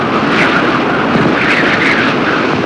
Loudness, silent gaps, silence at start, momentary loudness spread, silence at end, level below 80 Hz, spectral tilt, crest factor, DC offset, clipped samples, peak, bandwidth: -11 LUFS; none; 0 s; 3 LU; 0 s; -44 dBFS; -5.5 dB/octave; 10 dB; under 0.1%; under 0.1%; -2 dBFS; 11 kHz